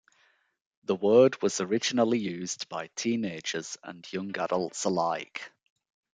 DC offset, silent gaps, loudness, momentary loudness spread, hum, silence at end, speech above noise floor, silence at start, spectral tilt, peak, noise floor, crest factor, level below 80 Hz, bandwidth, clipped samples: under 0.1%; none; -28 LUFS; 18 LU; none; 0.65 s; 40 dB; 0.9 s; -4 dB/octave; -10 dBFS; -68 dBFS; 20 dB; -76 dBFS; 9.6 kHz; under 0.1%